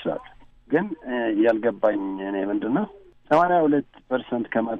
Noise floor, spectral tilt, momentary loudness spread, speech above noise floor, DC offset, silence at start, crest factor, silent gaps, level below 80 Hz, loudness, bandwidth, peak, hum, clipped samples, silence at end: -48 dBFS; -8 dB/octave; 10 LU; 25 dB; under 0.1%; 0 s; 16 dB; none; -60 dBFS; -24 LUFS; 6.4 kHz; -8 dBFS; none; under 0.1%; 0 s